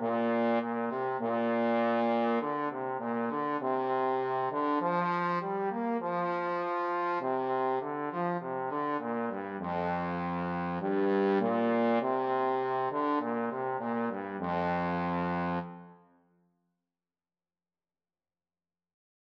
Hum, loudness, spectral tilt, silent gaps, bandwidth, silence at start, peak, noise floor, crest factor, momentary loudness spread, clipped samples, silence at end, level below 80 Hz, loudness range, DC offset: none; -31 LUFS; -9 dB/octave; none; 6.2 kHz; 0 s; -16 dBFS; under -90 dBFS; 16 dB; 6 LU; under 0.1%; 3.4 s; -70 dBFS; 5 LU; under 0.1%